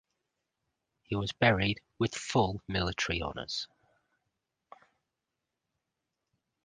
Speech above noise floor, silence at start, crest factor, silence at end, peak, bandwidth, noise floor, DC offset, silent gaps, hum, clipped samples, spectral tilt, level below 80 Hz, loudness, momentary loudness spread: 56 dB; 1.1 s; 26 dB; 3 s; -8 dBFS; 9.8 kHz; -87 dBFS; under 0.1%; none; none; under 0.1%; -5 dB/octave; -52 dBFS; -31 LUFS; 10 LU